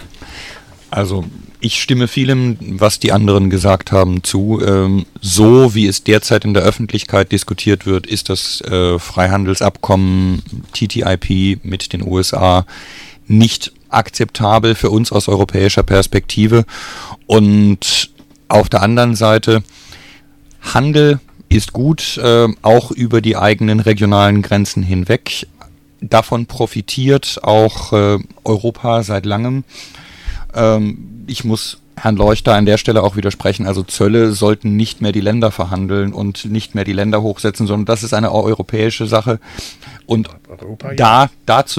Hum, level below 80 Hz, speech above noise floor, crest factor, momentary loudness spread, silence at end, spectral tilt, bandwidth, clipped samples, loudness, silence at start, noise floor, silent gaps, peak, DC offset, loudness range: none; -34 dBFS; 30 dB; 14 dB; 12 LU; 0 s; -5.5 dB/octave; 15.5 kHz; under 0.1%; -13 LUFS; 0 s; -42 dBFS; none; 0 dBFS; under 0.1%; 5 LU